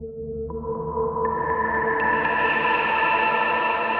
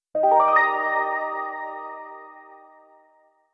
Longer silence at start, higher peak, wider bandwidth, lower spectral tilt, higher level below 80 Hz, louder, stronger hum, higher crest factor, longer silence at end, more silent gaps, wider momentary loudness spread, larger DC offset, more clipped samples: second, 0 s vs 0.15 s; about the same, -8 dBFS vs -6 dBFS; about the same, 5.6 kHz vs 6 kHz; first, -7.5 dB/octave vs -5 dB/octave; first, -46 dBFS vs -78 dBFS; about the same, -22 LUFS vs -21 LUFS; neither; about the same, 14 dB vs 18 dB; second, 0 s vs 0.95 s; neither; second, 10 LU vs 21 LU; neither; neither